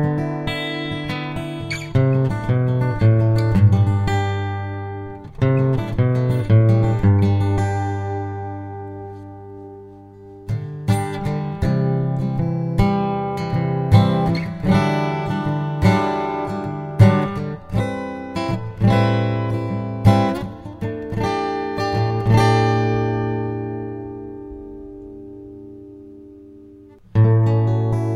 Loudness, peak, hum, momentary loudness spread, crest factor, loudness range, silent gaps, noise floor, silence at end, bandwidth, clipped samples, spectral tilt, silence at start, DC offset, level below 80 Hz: -20 LUFS; 0 dBFS; none; 19 LU; 18 dB; 9 LU; none; -44 dBFS; 0 s; 10 kHz; under 0.1%; -8 dB/octave; 0 s; under 0.1%; -38 dBFS